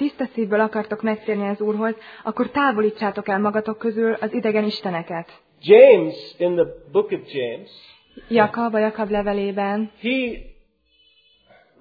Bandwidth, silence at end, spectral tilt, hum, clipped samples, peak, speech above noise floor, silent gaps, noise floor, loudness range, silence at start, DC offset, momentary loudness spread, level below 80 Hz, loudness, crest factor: 5 kHz; 1.3 s; -8.5 dB/octave; none; under 0.1%; 0 dBFS; 40 dB; none; -60 dBFS; 5 LU; 0 s; under 0.1%; 11 LU; -52 dBFS; -20 LUFS; 20 dB